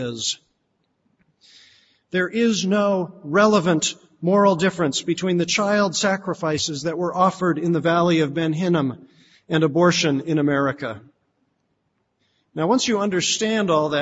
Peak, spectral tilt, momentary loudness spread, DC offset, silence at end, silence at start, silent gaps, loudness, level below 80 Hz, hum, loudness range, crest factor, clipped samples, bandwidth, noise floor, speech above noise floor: -4 dBFS; -4.5 dB/octave; 8 LU; under 0.1%; 0 s; 0 s; none; -20 LUFS; -62 dBFS; none; 4 LU; 18 dB; under 0.1%; 8 kHz; -71 dBFS; 51 dB